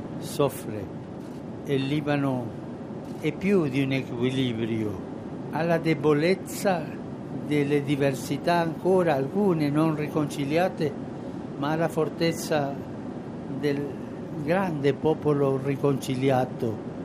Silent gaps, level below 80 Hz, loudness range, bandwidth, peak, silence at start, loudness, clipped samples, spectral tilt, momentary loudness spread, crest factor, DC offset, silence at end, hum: none; -60 dBFS; 4 LU; 15.5 kHz; -10 dBFS; 0 s; -27 LUFS; under 0.1%; -6.5 dB/octave; 12 LU; 18 dB; under 0.1%; 0 s; none